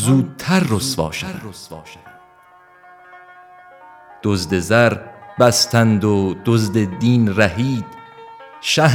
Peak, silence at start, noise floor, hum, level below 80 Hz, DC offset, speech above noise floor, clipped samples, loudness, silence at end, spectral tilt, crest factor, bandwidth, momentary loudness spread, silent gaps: 0 dBFS; 0 s; -48 dBFS; none; -48 dBFS; under 0.1%; 32 dB; under 0.1%; -17 LUFS; 0 s; -5 dB/octave; 18 dB; 17.5 kHz; 21 LU; none